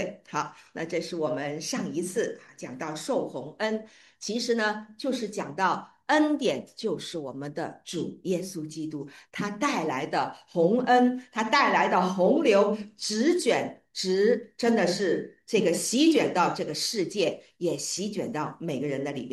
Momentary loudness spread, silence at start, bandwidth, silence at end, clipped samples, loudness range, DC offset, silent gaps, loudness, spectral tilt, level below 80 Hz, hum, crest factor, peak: 13 LU; 0 s; 12.5 kHz; 0 s; under 0.1%; 8 LU; under 0.1%; none; -27 LUFS; -4 dB/octave; -74 dBFS; none; 18 dB; -8 dBFS